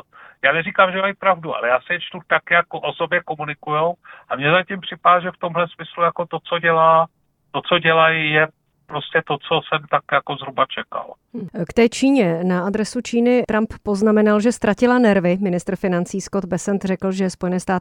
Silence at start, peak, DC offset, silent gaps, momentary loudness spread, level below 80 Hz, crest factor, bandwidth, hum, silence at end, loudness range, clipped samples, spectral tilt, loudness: 0.45 s; 0 dBFS; under 0.1%; none; 12 LU; -52 dBFS; 18 dB; 12 kHz; none; 0 s; 3 LU; under 0.1%; -5.5 dB/octave; -19 LUFS